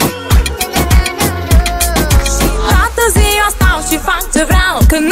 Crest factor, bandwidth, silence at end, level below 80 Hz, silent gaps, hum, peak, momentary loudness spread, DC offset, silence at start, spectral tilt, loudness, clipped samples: 10 dB; 16.5 kHz; 0 s; -14 dBFS; none; none; 0 dBFS; 4 LU; under 0.1%; 0 s; -4 dB/octave; -11 LUFS; under 0.1%